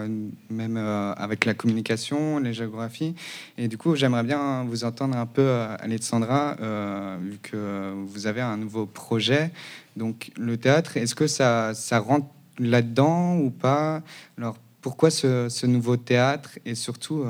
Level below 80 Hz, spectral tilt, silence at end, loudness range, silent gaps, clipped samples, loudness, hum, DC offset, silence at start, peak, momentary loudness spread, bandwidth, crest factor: -74 dBFS; -5.5 dB/octave; 0 s; 5 LU; none; under 0.1%; -25 LUFS; none; under 0.1%; 0 s; 0 dBFS; 12 LU; 16.5 kHz; 24 dB